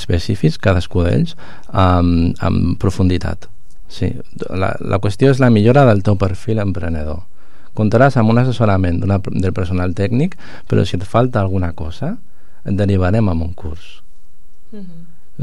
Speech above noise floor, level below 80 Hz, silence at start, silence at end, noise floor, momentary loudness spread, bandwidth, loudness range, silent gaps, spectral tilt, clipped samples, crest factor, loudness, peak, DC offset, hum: 29 dB; -34 dBFS; 0 s; 0 s; -45 dBFS; 16 LU; 11.5 kHz; 4 LU; none; -8 dB/octave; under 0.1%; 14 dB; -16 LUFS; 0 dBFS; 9%; none